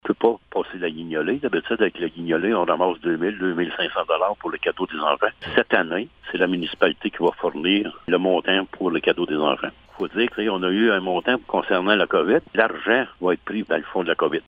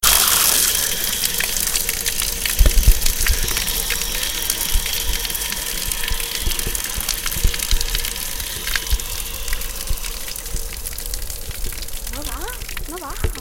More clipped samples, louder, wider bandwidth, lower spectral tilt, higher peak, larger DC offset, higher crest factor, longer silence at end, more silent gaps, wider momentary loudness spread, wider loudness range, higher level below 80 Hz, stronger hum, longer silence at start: neither; about the same, -22 LUFS vs -20 LUFS; second, 5 kHz vs 17.5 kHz; first, -7.5 dB/octave vs -1 dB/octave; about the same, 0 dBFS vs 0 dBFS; neither; about the same, 22 dB vs 20 dB; about the same, 0.05 s vs 0 s; neither; second, 7 LU vs 12 LU; second, 2 LU vs 9 LU; second, -58 dBFS vs -24 dBFS; neither; about the same, 0.05 s vs 0 s